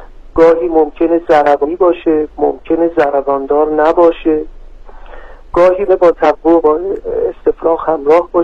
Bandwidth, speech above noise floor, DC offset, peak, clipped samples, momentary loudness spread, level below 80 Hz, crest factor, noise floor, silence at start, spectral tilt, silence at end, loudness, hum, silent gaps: 7 kHz; 20 dB; under 0.1%; 0 dBFS; under 0.1%; 7 LU; -34 dBFS; 12 dB; -31 dBFS; 0 s; -7 dB/octave; 0 s; -12 LUFS; none; none